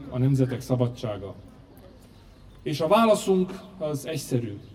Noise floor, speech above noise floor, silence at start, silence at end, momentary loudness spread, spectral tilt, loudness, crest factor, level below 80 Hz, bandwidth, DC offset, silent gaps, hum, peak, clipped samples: -50 dBFS; 25 dB; 0 s; 0 s; 15 LU; -6.5 dB/octave; -25 LUFS; 18 dB; -54 dBFS; 16 kHz; under 0.1%; none; none; -8 dBFS; under 0.1%